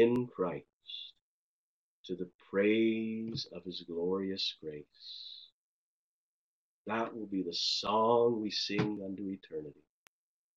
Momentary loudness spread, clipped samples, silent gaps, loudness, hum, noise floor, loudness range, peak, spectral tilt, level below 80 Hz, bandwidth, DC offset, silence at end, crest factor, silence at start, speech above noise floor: 17 LU; under 0.1%; 0.73-0.81 s, 1.21-2.04 s, 2.34-2.39 s, 5.52-6.85 s; -34 LUFS; none; under -90 dBFS; 7 LU; -16 dBFS; -5 dB/octave; -76 dBFS; 8 kHz; under 0.1%; 0.85 s; 20 dB; 0 s; over 56 dB